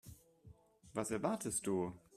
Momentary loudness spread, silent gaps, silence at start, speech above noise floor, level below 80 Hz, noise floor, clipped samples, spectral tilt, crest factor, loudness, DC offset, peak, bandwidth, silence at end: 8 LU; none; 0.05 s; 24 dB; -68 dBFS; -63 dBFS; under 0.1%; -5 dB/octave; 20 dB; -40 LUFS; under 0.1%; -22 dBFS; 15.5 kHz; 0 s